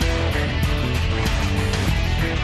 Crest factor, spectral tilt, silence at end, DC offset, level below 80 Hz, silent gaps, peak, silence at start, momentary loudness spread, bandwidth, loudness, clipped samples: 10 dB; -5.5 dB/octave; 0 s; under 0.1%; -24 dBFS; none; -10 dBFS; 0 s; 1 LU; 13.5 kHz; -22 LUFS; under 0.1%